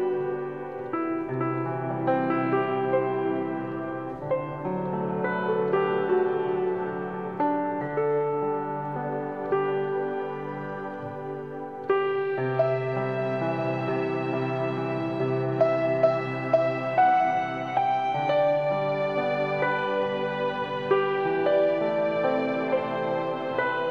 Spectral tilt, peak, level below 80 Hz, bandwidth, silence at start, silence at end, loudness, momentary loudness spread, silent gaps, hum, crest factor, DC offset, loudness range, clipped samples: -8.5 dB/octave; -10 dBFS; -68 dBFS; 6.6 kHz; 0 s; 0 s; -27 LUFS; 9 LU; none; none; 18 dB; 0.1%; 4 LU; under 0.1%